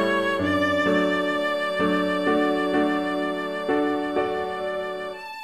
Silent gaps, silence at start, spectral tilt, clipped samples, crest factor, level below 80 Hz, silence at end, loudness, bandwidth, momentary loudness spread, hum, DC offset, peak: none; 0 s; -5.5 dB/octave; under 0.1%; 14 dB; -58 dBFS; 0 s; -24 LUFS; 14 kHz; 7 LU; none; 0.2%; -10 dBFS